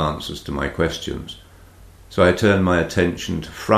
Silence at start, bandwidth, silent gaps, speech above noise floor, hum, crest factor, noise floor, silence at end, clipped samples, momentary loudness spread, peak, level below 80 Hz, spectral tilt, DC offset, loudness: 0 s; 15 kHz; none; 25 dB; none; 18 dB; -45 dBFS; 0 s; under 0.1%; 14 LU; -2 dBFS; -38 dBFS; -5.5 dB/octave; under 0.1%; -20 LUFS